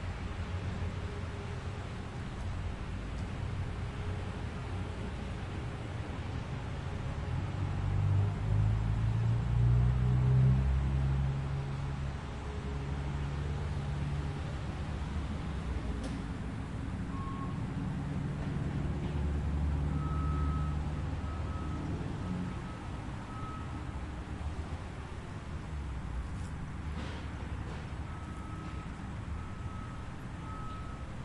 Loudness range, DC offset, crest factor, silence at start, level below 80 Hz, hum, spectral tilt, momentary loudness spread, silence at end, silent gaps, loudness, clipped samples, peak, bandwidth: 11 LU; under 0.1%; 18 dB; 0 s; -40 dBFS; none; -7.5 dB/octave; 11 LU; 0 s; none; -36 LUFS; under 0.1%; -18 dBFS; 11 kHz